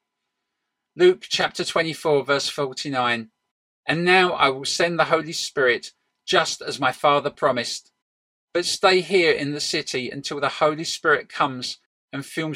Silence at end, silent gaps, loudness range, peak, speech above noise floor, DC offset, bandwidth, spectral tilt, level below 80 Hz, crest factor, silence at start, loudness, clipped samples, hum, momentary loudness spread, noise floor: 0 s; 3.51-3.83 s, 8.02-8.48 s, 11.86-12.08 s; 2 LU; -2 dBFS; 58 dB; under 0.1%; 15 kHz; -3.5 dB/octave; -66 dBFS; 22 dB; 0.95 s; -21 LUFS; under 0.1%; none; 11 LU; -80 dBFS